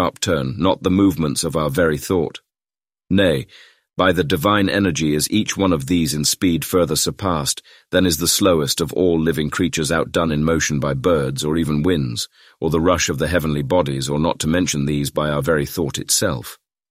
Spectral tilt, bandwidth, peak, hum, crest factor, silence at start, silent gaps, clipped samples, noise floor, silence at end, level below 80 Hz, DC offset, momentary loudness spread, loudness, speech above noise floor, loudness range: -4.5 dB/octave; 16 kHz; -2 dBFS; none; 16 dB; 0 s; none; under 0.1%; under -90 dBFS; 0.35 s; -40 dBFS; under 0.1%; 5 LU; -19 LUFS; over 72 dB; 2 LU